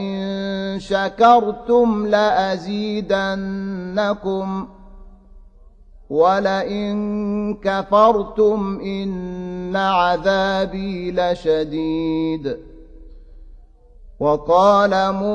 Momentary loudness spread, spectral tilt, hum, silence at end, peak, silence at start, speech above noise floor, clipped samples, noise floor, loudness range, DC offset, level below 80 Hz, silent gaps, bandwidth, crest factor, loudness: 11 LU; -6.5 dB/octave; none; 0 s; -2 dBFS; 0 s; 27 dB; under 0.1%; -45 dBFS; 6 LU; under 0.1%; -44 dBFS; none; 9 kHz; 18 dB; -19 LUFS